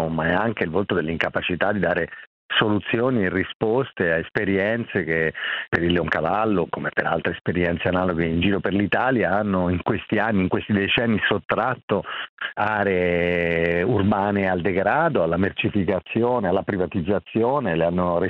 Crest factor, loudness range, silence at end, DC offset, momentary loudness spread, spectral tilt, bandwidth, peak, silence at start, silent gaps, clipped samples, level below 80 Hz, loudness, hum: 18 dB; 1 LU; 0 s; under 0.1%; 4 LU; -8.5 dB/octave; 6 kHz; -2 dBFS; 0 s; 2.27-2.49 s, 3.55-3.60 s, 7.41-7.45 s, 11.45-11.49 s, 11.83-11.88 s, 12.29-12.37 s; under 0.1%; -48 dBFS; -22 LUFS; none